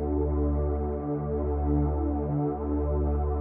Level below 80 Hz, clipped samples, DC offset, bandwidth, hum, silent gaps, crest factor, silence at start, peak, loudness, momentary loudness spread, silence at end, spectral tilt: -30 dBFS; under 0.1%; under 0.1%; 2.3 kHz; none; none; 10 dB; 0 s; -16 dBFS; -28 LUFS; 4 LU; 0 s; -13.5 dB/octave